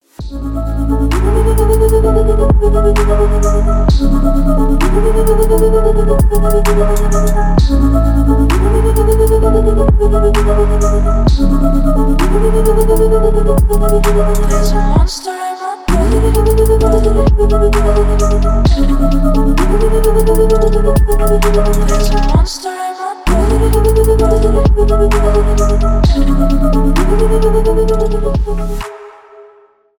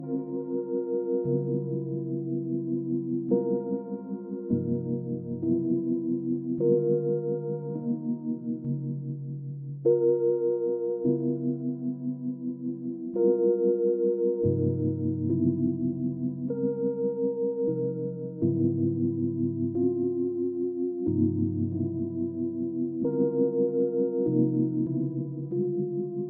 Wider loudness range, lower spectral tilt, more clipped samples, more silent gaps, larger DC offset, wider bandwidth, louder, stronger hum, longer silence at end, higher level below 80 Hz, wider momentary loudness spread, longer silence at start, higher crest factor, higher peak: about the same, 2 LU vs 3 LU; second, -7 dB/octave vs -17 dB/octave; neither; neither; neither; first, 19.5 kHz vs 1.5 kHz; first, -12 LUFS vs -28 LUFS; neither; first, 0.9 s vs 0 s; first, -12 dBFS vs -68 dBFS; second, 5 LU vs 8 LU; first, 0.2 s vs 0 s; second, 10 dB vs 16 dB; first, 0 dBFS vs -10 dBFS